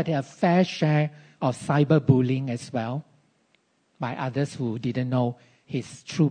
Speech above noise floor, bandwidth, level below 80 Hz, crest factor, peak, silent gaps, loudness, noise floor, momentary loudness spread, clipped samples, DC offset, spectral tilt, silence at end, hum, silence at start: 43 dB; 9.6 kHz; -64 dBFS; 18 dB; -6 dBFS; none; -25 LUFS; -67 dBFS; 12 LU; under 0.1%; under 0.1%; -7.5 dB/octave; 0 s; none; 0 s